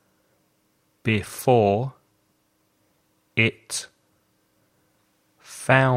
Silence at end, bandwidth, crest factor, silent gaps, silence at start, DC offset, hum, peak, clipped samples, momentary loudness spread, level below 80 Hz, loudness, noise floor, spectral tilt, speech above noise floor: 0 s; 16 kHz; 24 dB; none; 1.05 s; under 0.1%; none; -2 dBFS; under 0.1%; 15 LU; -62 dBFS; -23 LUFS; -68 dBFS; -5 dB/octave; 47 dB